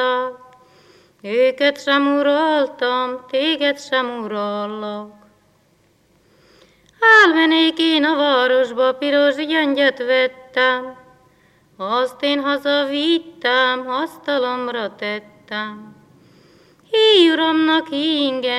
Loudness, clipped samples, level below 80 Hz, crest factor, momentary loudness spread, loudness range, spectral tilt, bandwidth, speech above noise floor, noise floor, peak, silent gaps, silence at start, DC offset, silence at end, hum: -17 LUFS; under 0.1%; -68 dBFS; 18 dB; 14 LU; 8 LU; -3.5 dB/octave; 12 kHz; 41 dB; -58 dBFS; 0 dBFS; none; 0 s; under 0.1%; 0 s; none